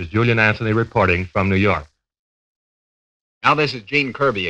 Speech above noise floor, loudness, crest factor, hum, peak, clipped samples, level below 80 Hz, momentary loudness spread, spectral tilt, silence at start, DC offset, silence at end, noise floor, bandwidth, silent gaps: over 72 dB; -18 LUFS; 20 dB; none; 0 dBFS; under 0.1%; -46 dBFS; 4 LU; -7 dB/octave; 0 s; under 0.1%; 0 s; under -90 dBFS; 8.4 kHz; 2.19-3.41 s